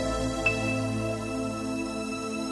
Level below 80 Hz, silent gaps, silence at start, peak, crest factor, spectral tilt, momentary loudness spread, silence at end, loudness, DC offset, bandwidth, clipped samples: -44 dBFS; none; 0 s; -14 dBFS; 16 dB; -5 dB/octave; 6 LU; 0 s; -29 LUFS; under 0.1%; 12 kHz; under 0.1%